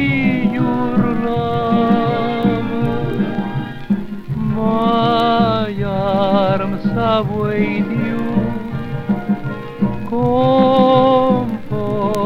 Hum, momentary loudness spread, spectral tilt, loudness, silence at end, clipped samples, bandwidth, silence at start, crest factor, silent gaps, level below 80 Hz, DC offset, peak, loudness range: none; 9 LU; -8.5 dB/octave; -17 LUFS; 0 s; under 0.1%; 7.2 kHz; 0 s; 16 dB; none; -38 dBFS; under 0.1%; 0 dBFS; 3 LU